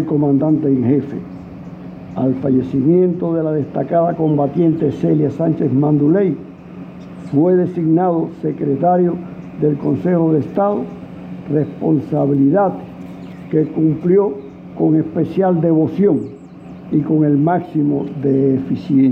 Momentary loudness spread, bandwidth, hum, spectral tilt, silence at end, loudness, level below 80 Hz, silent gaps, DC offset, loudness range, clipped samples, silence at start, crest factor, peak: 18 LU; 4.5 kHz; none; -11.5 dB/octave; 0 s; -16 LUFS; -52 dBFS; none; under 0.1%; 2 LU; under 0.1%; 0 s; 12 dB; -4 dBFS